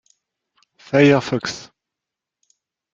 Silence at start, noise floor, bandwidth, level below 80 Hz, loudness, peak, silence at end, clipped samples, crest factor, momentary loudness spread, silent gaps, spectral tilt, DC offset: 0.9 s; -85 dBFS; 7.6 kHz; -62 dBFS; -17 LUFS; -2 dBFS; 1.3 s; under 0.1%; 20 dB; 15 LU; none; -6 dB/octave; under 0.1%